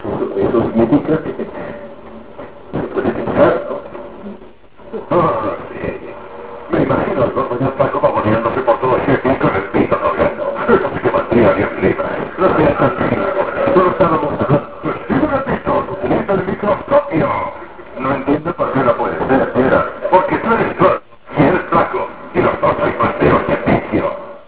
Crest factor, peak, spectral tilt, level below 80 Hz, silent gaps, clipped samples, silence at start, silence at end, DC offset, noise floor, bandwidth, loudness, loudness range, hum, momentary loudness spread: 16 dB; 0 dBFS; -11 dB/octave; -38 dBFS; none; under 0.1%; 0 s; 0.05 s; 1%; -40 dBFS; 4 kHz; -16 LUFS; 5 LU; none; 13 LU